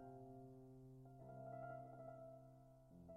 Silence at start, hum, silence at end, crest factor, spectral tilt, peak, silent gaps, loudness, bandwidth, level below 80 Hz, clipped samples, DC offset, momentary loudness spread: 0 s; none; 0 s; 14 dB; -9.5 dB/octave; -44 dBFS; none; -59 LUFS; 11 kHz; -76 dBFS; under 0.1%; under 0.1%; 11 LU